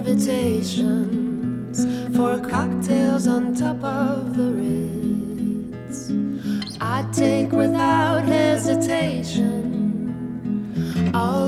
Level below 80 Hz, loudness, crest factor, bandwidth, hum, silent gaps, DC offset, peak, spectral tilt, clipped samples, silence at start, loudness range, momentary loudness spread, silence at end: -50 dBFS; -22 LUFS; 14 dB; 15 kHz; none; none; under 0.1%; -6 dBFS; -6 dB/octave; under 0.1%; 0 s; 4 LU; 8 LU; 0 s